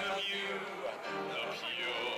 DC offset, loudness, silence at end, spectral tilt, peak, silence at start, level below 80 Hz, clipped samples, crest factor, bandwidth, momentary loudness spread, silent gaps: under 0.1%; -37 LUFS; 0 s; -2.5 dB/octave; -30 dBFS; 0 s; -76 dBFS; under 0.1%; 8 dB; 19 kHz; 5 LU; none